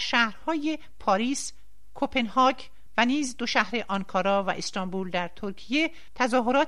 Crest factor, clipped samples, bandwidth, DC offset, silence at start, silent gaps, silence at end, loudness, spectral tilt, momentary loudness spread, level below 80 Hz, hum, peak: 20 dB; under 0.1%; 13 kHz; 1%; 0 s; none; 0 s; -27 LUFS; -3.5 dB/octave; 9 LU; -56 dBFS; none; -6 dBFS